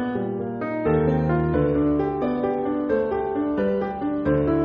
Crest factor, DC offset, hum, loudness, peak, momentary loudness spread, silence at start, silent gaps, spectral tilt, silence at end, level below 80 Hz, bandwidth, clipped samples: 14 dB; under 0.1%; none; -23 LUFS; -8 dBFS; 5 LU; 0 s; none; -8.5 dB/octave; 0 s; -40 dBFS; 5.2 kHz; under 0.1%